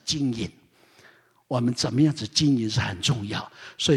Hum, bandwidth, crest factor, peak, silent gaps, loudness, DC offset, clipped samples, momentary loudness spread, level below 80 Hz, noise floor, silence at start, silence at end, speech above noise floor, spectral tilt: none; 13 kHz; 18 dB; -8 dBFS; none; -25 LUFS; under 0.1%; under 0.1%; 11 LU; -54 dBFS; -57 dBFS; 0.05 s; 0 s; 32 dB; -5 dB/octave